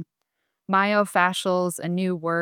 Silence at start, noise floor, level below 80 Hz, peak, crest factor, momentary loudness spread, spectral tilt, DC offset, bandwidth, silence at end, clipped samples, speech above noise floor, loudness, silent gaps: 0 s; -78 dBFS; -76 dBFS; -6 dBFS; 18 dB; 6 LU; -5 dB/octave; under 0.1%; 17 kHz; 0 s; under 0.1%; 56 dB; -23 LUFS; none